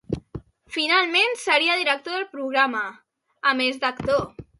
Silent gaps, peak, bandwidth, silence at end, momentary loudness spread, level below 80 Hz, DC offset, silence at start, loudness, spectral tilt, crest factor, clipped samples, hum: none; -6 dBFS; 11.5 kHz; 0.15 s; 14 LU; -52 dBFS; under 0.1%; 0.1 s; -21 LUFS; -3.5 dB/octave; 18 dB; under 0.1%; none